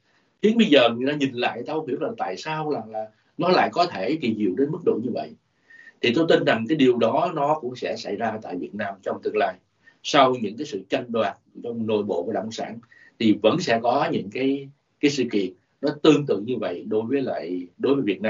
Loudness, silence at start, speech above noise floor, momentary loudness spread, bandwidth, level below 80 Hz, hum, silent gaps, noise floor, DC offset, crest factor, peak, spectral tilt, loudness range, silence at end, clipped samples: -23 LUFS; 0.45 s; 28 dB; 12 LU; 7.6 kHz; -70 dBFS; none; none; -51 dBFS; under 0.1%; 20 dB; -2 dBFS; -4 dB/octave; 2 LU; 0 s; under 0.1%